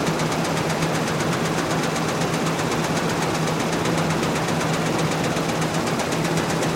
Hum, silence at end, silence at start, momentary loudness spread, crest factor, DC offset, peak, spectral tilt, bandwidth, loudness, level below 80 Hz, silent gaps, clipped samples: none; 0 s; 0 s; 1 LU; 14 dB; under 0.1%; -8 dBFS; -4.5 dB/octave; 16.5 kHz; -22 LUFS; -48 dBFS; none; under 0.1%